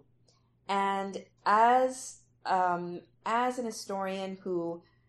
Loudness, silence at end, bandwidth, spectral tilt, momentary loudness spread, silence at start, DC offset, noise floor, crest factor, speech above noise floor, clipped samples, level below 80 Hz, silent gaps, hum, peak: -30 LUFS; 0.3 s; 13 kHz; -4.5 dB/octave; 16 LU; 0.7 s; under 0.1%; -67 dBFS; 20 dB; 37 dB; under 0.1%; -76 dBFS; none; none; -12 dBFS